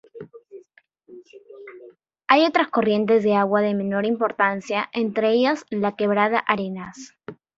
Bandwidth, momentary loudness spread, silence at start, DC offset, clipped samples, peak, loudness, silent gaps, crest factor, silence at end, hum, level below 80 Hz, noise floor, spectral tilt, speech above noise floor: 7.8 kHz; 23 LU; 0.15 s; under 0.1%; under 0.1%; -2 dBFS; -21 LUFS; none; 22 dB; 0.25 s; none; -66 dBFS; -57 dBFS; -6 dB/octave; 36 dB